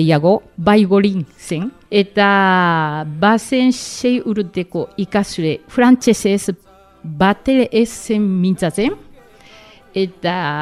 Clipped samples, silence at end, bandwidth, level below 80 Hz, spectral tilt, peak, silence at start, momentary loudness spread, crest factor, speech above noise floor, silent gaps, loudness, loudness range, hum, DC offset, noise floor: under 0.1%; 0 s; 14 kHz; -48 dBFS; -5.5 dB/octave; 0 dBFS; 0 s; 11 LU; 16 dB; 28 dB; none; -16 LUFS; 3 LU; none; under 0.1%; -43 dBFS